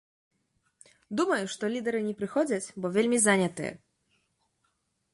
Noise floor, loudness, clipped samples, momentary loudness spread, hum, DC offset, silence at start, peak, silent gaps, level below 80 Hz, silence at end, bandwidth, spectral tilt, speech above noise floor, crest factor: -76 dBFS; -28 LUFS; under 0.1%; 10 LU; none; under 0.1%; 1.1 s; -10 dBFS; none; -72 dBFS; 1.35 s; 11.5 kHz; -4 dB/octave; 48 dB; 22 dB